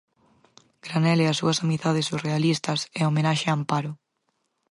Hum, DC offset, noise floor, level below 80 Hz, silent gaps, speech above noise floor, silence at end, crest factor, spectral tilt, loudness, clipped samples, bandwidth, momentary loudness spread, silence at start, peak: none; under 0.1%; -75 dBFS; -68 dBFS; none; 51 dB; 0.75 s; 16 dB; -5.5 dB/octave; -24 LUFS; under 0.1%; 11.5 kHz; 8 LU; 0.85 s; -8 dBFS